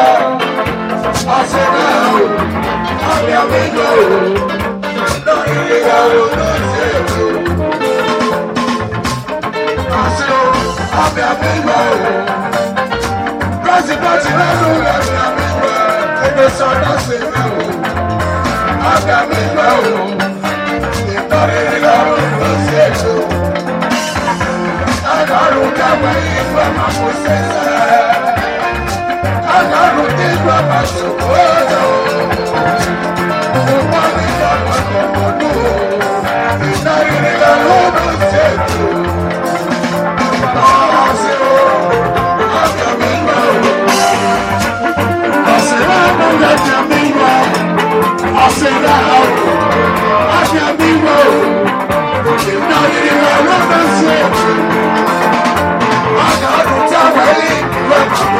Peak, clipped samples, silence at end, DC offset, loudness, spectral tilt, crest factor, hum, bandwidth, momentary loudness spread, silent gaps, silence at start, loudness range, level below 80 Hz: 0 dBFS; 0.3%; 0 s; under 0.1%; -11 LUFS; -5 dB/octave; 12 dB; none; 16.5 kHz; 6 LU; none; 0 s; 3 LU; -36 dBFS